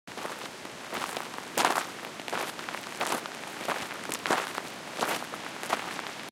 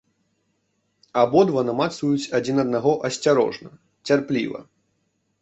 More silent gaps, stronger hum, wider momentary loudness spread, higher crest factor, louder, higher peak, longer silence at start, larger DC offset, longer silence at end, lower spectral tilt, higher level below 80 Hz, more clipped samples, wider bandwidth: neither; neither; about the same, 10 LU vs 11 LU; first, 26 dB vs 18 dB; second, -33 LUFS vs -21 LUFS; second, -8 dBFS vs -4 dBFS; second, 0.05 s vs 1.15 s; neither; second, 0 s vs 0.8 s; second, -2 dB/octave vs -5.5 dB/octave; second, -74 dBFS vs -64 dBFS; neither; first, 17 kHz vs 8.2 kHz